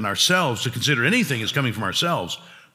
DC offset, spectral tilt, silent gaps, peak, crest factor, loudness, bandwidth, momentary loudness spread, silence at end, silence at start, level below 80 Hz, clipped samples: under 0.1%; -3.5 dB/octave; none; -6 dBFS; 18 dB; -21 LUFS; 16.5 kHz; 8 LU; 0.15 s; 0 s; -66 dBFS; under 0.1%